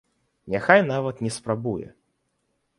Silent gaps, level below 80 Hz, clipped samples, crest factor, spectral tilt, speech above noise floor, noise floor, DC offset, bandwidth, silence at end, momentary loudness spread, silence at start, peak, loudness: none; -60 dBFS; under 0.1%; 24 dB; -5.5 dB/octave; 51 dB; -73 dBFS; under 0.1%; 11.5 kHz; 0.9 s; 12 LU; 0.45 s; 0 dBFS; -23 LUFS